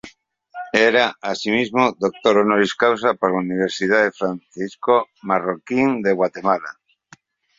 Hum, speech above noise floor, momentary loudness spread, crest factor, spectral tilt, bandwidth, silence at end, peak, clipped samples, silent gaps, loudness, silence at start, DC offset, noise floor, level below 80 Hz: none; 33 dB; 10 LU; 20 dB; -5 dB/octave; 7.8 kHz; 0.85 s; 0 dBFS; under 0.1%; none; -19 LUFS; 0.05 s; under 0.1%; -52 dBFS; -62 dBFS